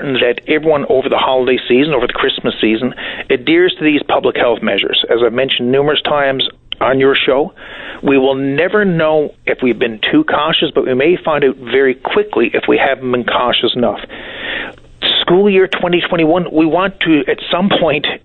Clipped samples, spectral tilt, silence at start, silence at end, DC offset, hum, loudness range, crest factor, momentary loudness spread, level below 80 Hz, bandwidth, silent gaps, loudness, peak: under 0.1%; -8 dB/octave; 0 s; 0.05 s; under 0.1%; none; 1 LU; 12 dB; 6 LU; -44 dBFS; 4.4 kHz; none; -13 LUFS; -2 dBFS